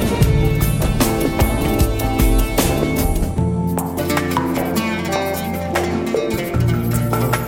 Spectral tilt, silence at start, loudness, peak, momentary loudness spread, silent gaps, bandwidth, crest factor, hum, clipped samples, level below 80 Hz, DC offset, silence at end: -5.5 dB/octave; 0 s; -18 LUFS; 0 dBFS; 4 LU; none; 17 kHz; 16 dB; none; under 0.1%; -24 dBFS; under 0.1%; 0 s